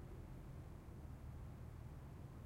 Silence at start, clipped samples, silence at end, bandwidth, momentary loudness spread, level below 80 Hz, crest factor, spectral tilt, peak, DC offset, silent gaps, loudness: 0 s; under 0.1%; 0 s; 16 kHz; 1 LU; -58 dBFS; 10 dB; -7.5 dB/octave; -42 dBFS; under 0.1%; none; -56 LUFS